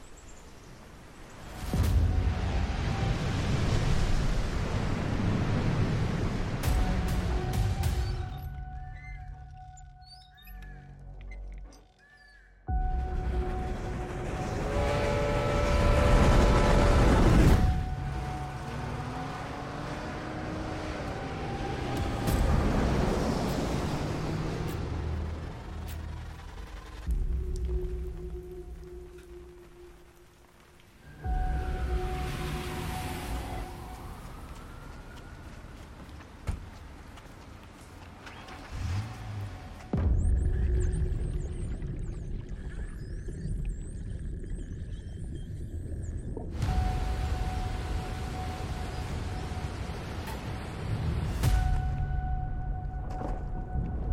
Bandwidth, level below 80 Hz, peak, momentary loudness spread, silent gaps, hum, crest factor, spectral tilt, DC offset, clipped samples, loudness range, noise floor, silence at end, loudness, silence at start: 16 kHz; -34 dBFS; -12 dBFS; 20 LU; none; none; 18 dB; -6.5 dB/octave; under 0.1%; under 0.1%; 16 LU; -57 dBFS; 0 s; -32 LUFS; 0 s